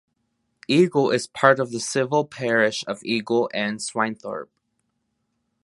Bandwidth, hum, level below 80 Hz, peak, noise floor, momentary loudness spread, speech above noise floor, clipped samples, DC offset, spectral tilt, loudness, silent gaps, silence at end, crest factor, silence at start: 11.5 kHz; none; -70 dBFS; 0 dBFS; -74 dBFS; 10 LU; 52 dB; under 0.1%; under 0.1%; -4.5 dB/octave; -22 LUFS; none; 1.2 s; 22 dB; 0.7 s